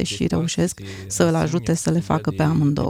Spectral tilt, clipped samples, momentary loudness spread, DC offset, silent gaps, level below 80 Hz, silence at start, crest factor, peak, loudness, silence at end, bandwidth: -5.5 dB/octave; under 0.1%; 5 LU; under 0.1%; none; -44 dBFS; 0 s; 18 dB; -4 dBFS; -21 LUFS; 0 s; 15 kHz